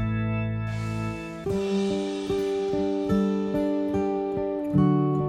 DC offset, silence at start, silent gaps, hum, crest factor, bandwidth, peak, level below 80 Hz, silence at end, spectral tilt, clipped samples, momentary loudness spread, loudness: under 0.1%; 0 s; none; none; 16 dB; 12.5 kHz; -10 dBFS; -46 dBFS; 0 s; -8 dB/octave; under 0.1%; 7 LU; -26 LUFS